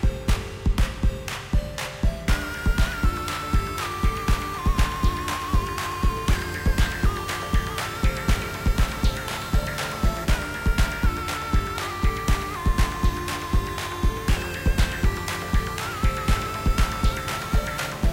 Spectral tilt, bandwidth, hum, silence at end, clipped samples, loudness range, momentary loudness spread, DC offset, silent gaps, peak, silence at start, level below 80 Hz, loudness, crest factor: -5 dB/octave; 16.5 kHz; none; 0 s; under 0.1%; 1 LU; 4 LU; 0.2%; none; -8 dBFS; 0 s; -26 dBFS; -26 LUFS; 14 dB